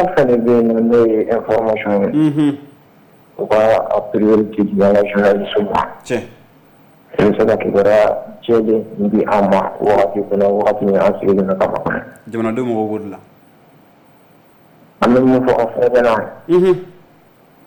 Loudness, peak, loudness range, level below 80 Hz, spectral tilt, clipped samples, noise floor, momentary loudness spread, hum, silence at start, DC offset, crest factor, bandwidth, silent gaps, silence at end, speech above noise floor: -15 LUFS; -6 dBFS; 4 LU; -46 dBFS; -7.5 dB/octave; under 0.1%; -48 dBFS; 9 LU; none; 0 s; under 0.1%; 10 dB; 19 kHz; none; 0.75 s; 34 dB